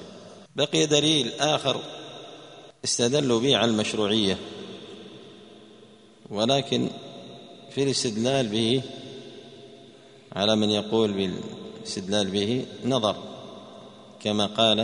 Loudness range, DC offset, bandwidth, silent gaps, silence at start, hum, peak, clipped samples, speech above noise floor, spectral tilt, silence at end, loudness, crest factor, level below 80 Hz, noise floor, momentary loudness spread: 4 LU; under 0.1%; 10.5 kHz; none; 0 s; none; -6 dBFS; under 0.1%; 27 dB; -4 dB/octave; 0 s; -24 LUFS; 22 dB; -64 dBFS; -52 dBFS; 23 LU